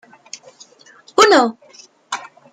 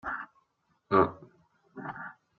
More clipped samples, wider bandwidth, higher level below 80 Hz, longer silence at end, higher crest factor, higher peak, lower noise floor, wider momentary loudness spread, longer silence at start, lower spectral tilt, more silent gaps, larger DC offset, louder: neither; first, 13.5 kHz vs 4.6 kHz; about the same, -66 dBFS vs -66 dBFS; about the same, 0.25 s vs 0.25 s; second, 18 dB vs 24 dB; first, 0 dBFS vs -8 dBFS; second, -48 dBFS vs -74 dBFS; first, 25 LU vs 21 LU; first, 1.2 s vs 0.05 s; second, -1.5 dB/octave vs -5.5 dB/octave; neither; neither; first, -14 LUFS vs -30 LUFS